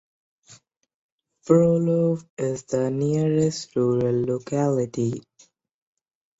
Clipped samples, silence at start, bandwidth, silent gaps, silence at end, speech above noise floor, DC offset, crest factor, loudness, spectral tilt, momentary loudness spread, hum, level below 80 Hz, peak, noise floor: under 0.1%; 0.5 s; 8 kHz; 0.94-1.19 s, 2.30-2.37 s; 1.2 s; 37 dB; under 0.1%; 20 dB; -23 LUFS; -7.5 dB/octave; 9 LU; none; -60 dBFS; -4 dBFS; -59 dBFS